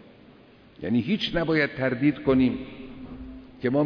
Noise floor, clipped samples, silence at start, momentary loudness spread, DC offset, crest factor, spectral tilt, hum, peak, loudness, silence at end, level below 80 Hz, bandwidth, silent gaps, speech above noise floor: -52 dBFS; under 0.1%; 0.8 s; 19 LU; under 0.1%; 16 dB; -8 dB/octave; none; -10 dBFS; -25 LUFS; 0 s; -48 dBFS; 5.4 kHz; none; 28 dB